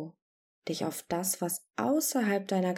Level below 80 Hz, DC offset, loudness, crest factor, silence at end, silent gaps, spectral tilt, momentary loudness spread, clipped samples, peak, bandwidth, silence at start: -74 dBFS; under 0.1%; -31 LUFS; 14 dB; 0 s; 0.22-0.62 s; -4 dB/octave; 10 LU; under 0.1%; -18 dBFS; 19 kHz; 0 s